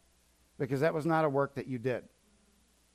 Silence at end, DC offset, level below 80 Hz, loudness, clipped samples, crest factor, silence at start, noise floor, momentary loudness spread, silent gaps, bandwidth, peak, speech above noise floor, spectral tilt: 0.95 s; under 0.1%; -68 dBFS; -32 LUFS; under 0.1%; 18 dB; 0.6 s; -68 dBFS; 9 LU; none; 15.5 kHz; -16 dBFS; 36 dB; -7.5 dB/octave